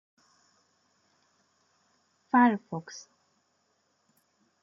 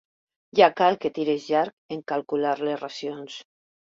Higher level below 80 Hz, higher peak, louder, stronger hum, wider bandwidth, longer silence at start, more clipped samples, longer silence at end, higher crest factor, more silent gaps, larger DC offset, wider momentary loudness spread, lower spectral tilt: second, -86 dBFS vs -72 dBFS; second, -10 dBFS vs -4 dBFS; about the same, -26 LUFS vs -24 LUFS; neither; about the same, 7.4 kHz vs 7.6 kHz; first, 2.35 s vs 0.55 s; neither; first, 1.65 s vs 0.45 s; about the same, 22 dB vs 22 dB; second, none vs 1.73-1.89 s; neither; first, 23 LU vs 17 LU; about the same, -6 dB/octave vs -5 dB/octave